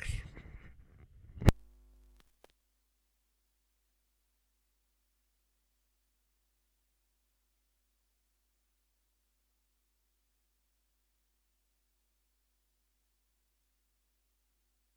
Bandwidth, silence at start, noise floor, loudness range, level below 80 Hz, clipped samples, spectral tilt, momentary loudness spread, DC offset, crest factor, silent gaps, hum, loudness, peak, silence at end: over 20 kHz; 0 s; -78 dBFS; 0 LU; -48 dBFS; under 0.1%; -6.5 dB/octave; 26 LU; under 0.1%; 38 dB; none; 50 Hz at -75 dBFS; -33 LUFS; -6 dBFS; 13.45 s